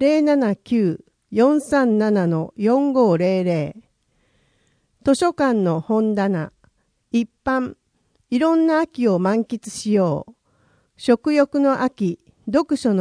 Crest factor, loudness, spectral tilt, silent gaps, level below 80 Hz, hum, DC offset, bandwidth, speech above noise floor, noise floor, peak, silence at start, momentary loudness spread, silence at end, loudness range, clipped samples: 16 dB; -20 LUFS; -7 dB/octave; none; -58 dBFS; none; under 0.1%; 10.5 kHz; 47 dB; -66 dBFS; -4 dBFS; 0 s; 9 LU; 0 s; 3 LU; under 0.1%